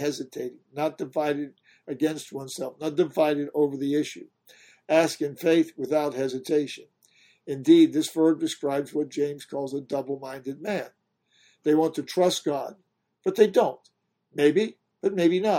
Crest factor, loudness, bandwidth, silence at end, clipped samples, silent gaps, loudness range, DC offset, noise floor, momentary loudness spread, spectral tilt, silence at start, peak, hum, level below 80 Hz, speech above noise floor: 20 dB; -26 LUFS; 16.5 kHz; 0 s; under 0.1%; none; 5 LU; under 0.1%; -65 dBFS; 14 LU; -5 dB/octave; 0 s; -6 dBFS; none; -74 dBFS; 40 dB